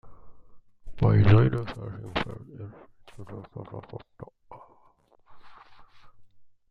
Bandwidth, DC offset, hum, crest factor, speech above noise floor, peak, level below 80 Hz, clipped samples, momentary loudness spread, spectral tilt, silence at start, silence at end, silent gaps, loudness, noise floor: 5.4 kHz; under 0.1%; none; 24 dB; 36 dB; -4 dBFS; -46 dBFS; under 0.1%; 27 LU; -9 dB/octave; 0.05 s; 0.25 s; none; -24 LUFS; -61 dBFS